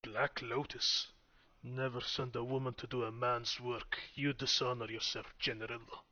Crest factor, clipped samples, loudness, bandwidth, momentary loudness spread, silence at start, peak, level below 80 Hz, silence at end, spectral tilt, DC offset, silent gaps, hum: 20 dB; under 0.1%; -38 LUFS; 6.8 kHz; 10 LU; 0.05 s; -20 dBFS; -64 dBFS; 0.1 s; -2.5 dB/octave; under 0.1%; none; none